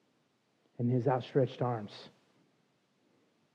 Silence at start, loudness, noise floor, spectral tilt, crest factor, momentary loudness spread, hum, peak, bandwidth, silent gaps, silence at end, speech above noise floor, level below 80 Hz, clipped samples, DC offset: 0.8 s; -33 LUFS; -74 dBFS; -9 dB/octave; 20 dB; 14 LU; none; -16 dBFS; 7 kHz; none; 1.45 s; 42 dB; -88 dBFS; under 0.1%; under 0.1%